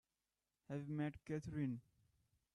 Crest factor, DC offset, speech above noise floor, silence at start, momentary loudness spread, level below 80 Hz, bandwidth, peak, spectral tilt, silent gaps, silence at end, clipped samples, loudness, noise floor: 18 dB; under 0.1%; over 45 dB; 0.7 s; 7 LU; -72 dBFS; 10.5 kHz; -30 dBFS; -8.5 dB/octave; none; 0.75 s; under 0.1%; -47 LUFS; under -90 dBFS